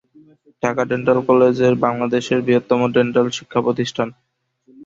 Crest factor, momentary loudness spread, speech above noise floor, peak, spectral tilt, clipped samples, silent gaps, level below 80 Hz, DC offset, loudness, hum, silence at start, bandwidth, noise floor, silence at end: 16 dB; 8 LU; 37 dB; -2 dBFS; -6 dB/octave; under 0.1%; none; -58 dBFS; under 0.1%; -18 LUFS; none; 0.65 s; 7.6 kHz; -54 dBFS; 0.75 s